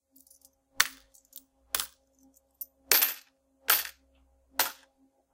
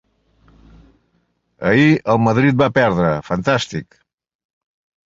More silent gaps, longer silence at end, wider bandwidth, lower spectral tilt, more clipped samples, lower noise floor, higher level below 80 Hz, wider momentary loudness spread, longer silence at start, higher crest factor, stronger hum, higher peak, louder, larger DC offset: neither; second, 0.6 s vs 1.25 s; first, 17 kHz vs 7.8 kHz; second, 2 dB/octave vs -6.5 dB/octave; neither; about the same, -67 dBFS vs -65 dBFS; second, -68 dBFS vs -48 dBFS; first, 26 LU vs 9 LU; second, 0.8 s vs 1.6 s; first, 30 dB vs 18 dB; neither; second, -4 dBFS vs 0 dBFS; second, -28 LUFS vs -16 LUFS; neither